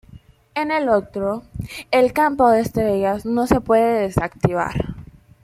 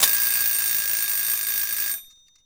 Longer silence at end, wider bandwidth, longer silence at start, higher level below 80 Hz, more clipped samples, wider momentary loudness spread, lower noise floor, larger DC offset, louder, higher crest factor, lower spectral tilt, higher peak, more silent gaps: about the same, 0.4 s vs 0.4 s; second, 16 kHz vs over 20 kHz; first, 0.15 s vs 0 s; first, -42 dBFS vs -62 dBFS; neither; first, 13 LU vs 6 LU; about the same, -46 dBFS vs -43 dBFS; neither; about the same, -19 LUFS vs -20 LUFS; about the same, 18 dB vs 22 dB; first, -6.5 dB/octave vs 3 dB/octave; about the same, -2 dBFS vs -2 dBFS; neither